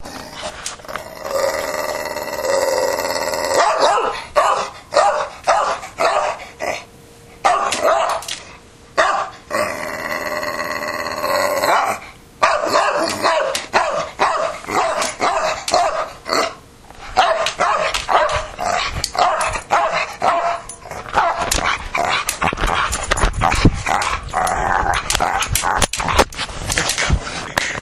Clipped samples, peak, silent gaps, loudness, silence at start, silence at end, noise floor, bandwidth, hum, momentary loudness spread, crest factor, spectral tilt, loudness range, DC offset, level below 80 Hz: under 0.1%; 0 dBFS; none; -18 LUFS; 0 s; 0 s; -42 dBFS; 15.5 kHz; none; 8 LU; 18 dB; -3 dB/octave; 3 LU; under 0.1%; -32 dBFS